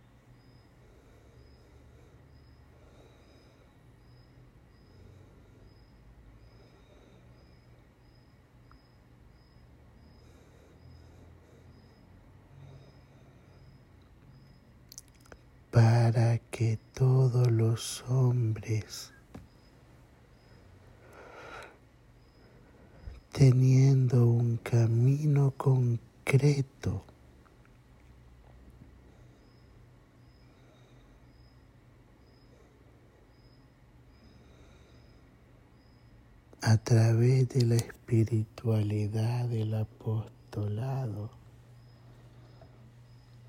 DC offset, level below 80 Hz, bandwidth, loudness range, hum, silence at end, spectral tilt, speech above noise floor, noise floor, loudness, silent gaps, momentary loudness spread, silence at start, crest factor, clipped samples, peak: under 0.1%; -60 dBFS; 12.5 kHz; 14 LU; none; 2.2 s; -7.5 dB/octave; 32 dB; -59 dBFS; -28 LUFS; none; 26 LU; 12.6 s; 22 dB; under 0.1%; -10 dBFS